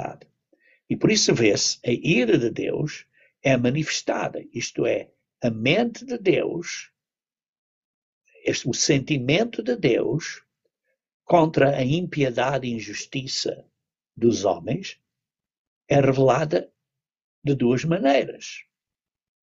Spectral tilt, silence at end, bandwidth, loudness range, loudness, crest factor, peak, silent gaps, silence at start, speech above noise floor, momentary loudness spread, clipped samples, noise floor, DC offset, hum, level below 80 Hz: -4.5 dB/octave; 0.8 s; 8 kHz; 4 LU; -23 LUFS; 20 dB; -4 dBFS; 7.49-8.21 s, 11.14-11.20 s, 15.58-15.81 s, 17.24-17.42 s; 0 s; over 68 dB; 12 LU; under 0.1%; under -90 dBFS; under 0.1%; none; -58 dBFS